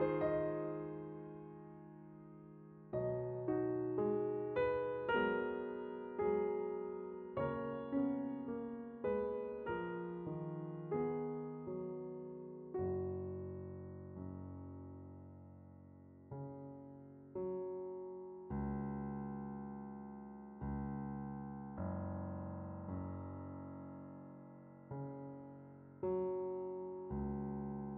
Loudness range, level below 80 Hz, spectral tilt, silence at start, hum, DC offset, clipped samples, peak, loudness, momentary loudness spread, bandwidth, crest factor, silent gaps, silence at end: 11 LU; -64 dBFS; -7.5 dB/octave; 0 s; none; under 0.1%; under 0.1%; -24 dBFS; -43 LUFS; 18 LU; 4.3 kHz; 18 dB; none; 0 s